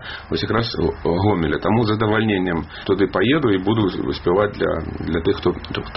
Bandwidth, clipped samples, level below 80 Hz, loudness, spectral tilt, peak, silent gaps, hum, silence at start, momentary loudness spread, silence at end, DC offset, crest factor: 5.8 kHz; under 0.1%; -38 dBFS; -20 LUFS; -5 dB/octave; -2 dBFS; none; none; 0 s; 6 LU; 0 s; 0.2%; 16 dB